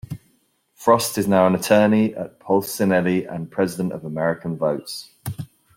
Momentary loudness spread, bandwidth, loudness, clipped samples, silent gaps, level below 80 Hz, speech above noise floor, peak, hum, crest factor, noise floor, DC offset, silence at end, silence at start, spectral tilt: 16 LU; 16.5 kHz; -20 LUFS; under 0.1%; none; -60 dBFS; 44 dB; -2 dBFS; none; 18 dB; -64 dBFS; under 0.1%; 0.3 s; 0.1 s; -5.5 dB/octave